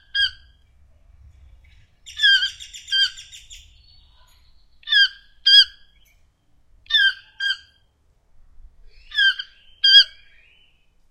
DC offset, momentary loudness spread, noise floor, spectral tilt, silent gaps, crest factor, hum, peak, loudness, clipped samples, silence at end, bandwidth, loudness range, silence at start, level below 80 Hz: under 0.1%; 24 LU; -61 dBFS; 3.5 dB/octave; none; 22 dB; none; -2 dBFS; -16 LUFS; under 0.1%; 1.05 s; 15 kHz; 5 LU; 0.15 s; -54 dBFS